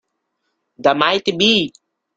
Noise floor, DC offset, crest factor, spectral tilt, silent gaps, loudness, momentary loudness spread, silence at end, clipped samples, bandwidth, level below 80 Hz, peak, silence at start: -73 dBFS; under 0.1%; 18 dB; -4 dB/octave; none; -16 LUFS; 5 LU; 0.5 s; under 0.1%; 9 kHz; -58 dBFS; 0 dBFS; 0.8 s